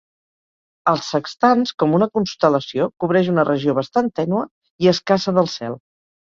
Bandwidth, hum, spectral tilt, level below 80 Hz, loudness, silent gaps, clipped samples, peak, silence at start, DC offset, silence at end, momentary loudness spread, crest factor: 7.6 kHz; none; -6 dB/octave; -60 dBFS; -19 LUFS; 4.51-4.62 s, 4.70-4.79 s; under 0.1%; -2 dBFS; 0.85 s; under 0.1%; 0.55 s; 7 LU; 18 dB